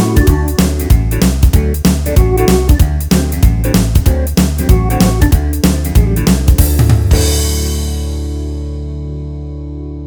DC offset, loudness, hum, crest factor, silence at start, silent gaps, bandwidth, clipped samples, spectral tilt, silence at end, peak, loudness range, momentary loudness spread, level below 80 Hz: 0.3%; -12 LUFS; none; 10 dB; 0 s; none; over 20 kHz; 0.4%; -6 dB/octave; 0 s; 0 dBFS; 3 LU; 12 LU; -14 dBFS